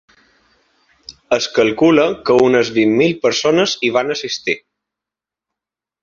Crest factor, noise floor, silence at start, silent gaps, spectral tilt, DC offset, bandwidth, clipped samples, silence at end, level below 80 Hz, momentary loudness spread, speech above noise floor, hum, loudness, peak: 16 dB; -87 dBFS; 1.1 s; none; -4.5 dB/octave; under 0.1%; 7.6 kHz; under 0.1%; 1.45 s; -56 dBFS; 8 LU; 72 dB; none; -15 LUFS; 0 dBFS